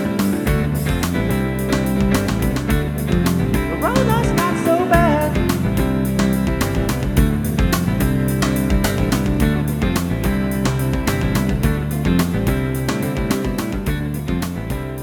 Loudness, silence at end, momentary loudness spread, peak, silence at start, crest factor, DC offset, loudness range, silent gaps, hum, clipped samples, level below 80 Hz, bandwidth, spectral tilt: -19 LUFS; 0 s; 4 LU; 0 dBFS; 0 s; 16 dB; under 0.1%; 2 LU; none; none; under 0.1%; -26 dBFS; 19 kHz; -6 dB/octave